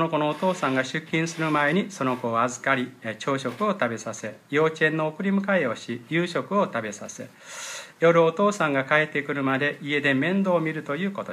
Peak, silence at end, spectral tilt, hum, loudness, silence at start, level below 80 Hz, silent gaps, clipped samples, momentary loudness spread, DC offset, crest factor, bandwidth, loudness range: -6 dBFS; 0 s; -5.5 dB/octave; none; -24 LUFS; 0 s; -74 dBFS; none; under 0.1%; 12 LU; under 0.1%; 18 dB; 14.5 kHz; 3 LU